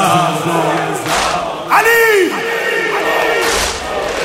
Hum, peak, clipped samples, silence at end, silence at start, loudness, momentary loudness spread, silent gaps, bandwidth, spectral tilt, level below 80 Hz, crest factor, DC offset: none; 0 dBFS; under 0.1%; 0 s; 0 s; -13 LUFS; 8 LU; none; 16 kHz; -3 dB/octave; -38 dBFS; 14 dB; under 0.1%